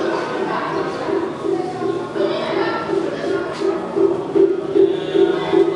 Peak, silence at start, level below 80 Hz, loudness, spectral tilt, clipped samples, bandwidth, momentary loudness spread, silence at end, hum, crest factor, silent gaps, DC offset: -4 dBFS; 0 s; -58 dBFS; -19 LUFS; -6 dB/octave; under 0.1%; 10.5 kHz; 6 LU; 0 s; none; 16 dB; none; under 0.1%